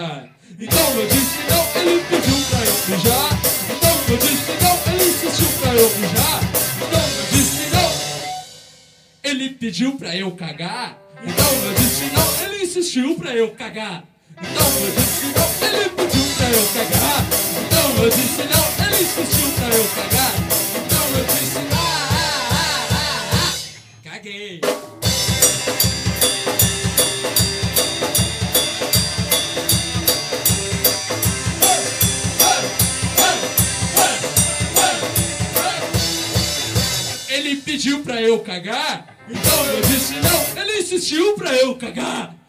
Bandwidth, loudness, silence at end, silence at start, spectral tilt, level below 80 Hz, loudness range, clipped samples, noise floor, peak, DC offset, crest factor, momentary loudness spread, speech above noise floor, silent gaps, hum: 16 kHz; -17 LUFS; 0.15 s; 0 s; -3 dB/octave; -36 dBFS; 4 LU; under 0.1%; -49 dBFS; 0 dBFS; under 0.1%; 18 dB; 9 LU; 31 dB; none; none